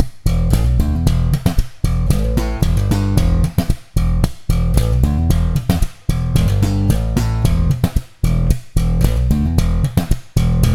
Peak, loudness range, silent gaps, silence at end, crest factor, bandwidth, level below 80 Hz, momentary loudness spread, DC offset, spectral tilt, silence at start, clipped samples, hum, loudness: 0 dBFS; 1 LU; none; 0 s; 14 dB; 16.5 kHz; -18 dBFS; 4 LU; under 0.1%; -7 dB/octave; 0 s; under 0.1%; none; -17 LUFS